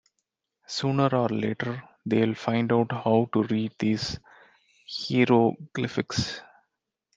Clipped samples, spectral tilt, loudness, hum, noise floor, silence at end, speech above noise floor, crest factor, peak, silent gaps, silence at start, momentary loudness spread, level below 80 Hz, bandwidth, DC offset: under 0.1%; -6 dB/octave; -26 LUFS; none; -81 dBFS; 0.75 s; 56 dB; 20 dB; -6 dBFS; none; 0.7 s; 11 LU; -60 dBFS; 7.8 kHz; under 0.1%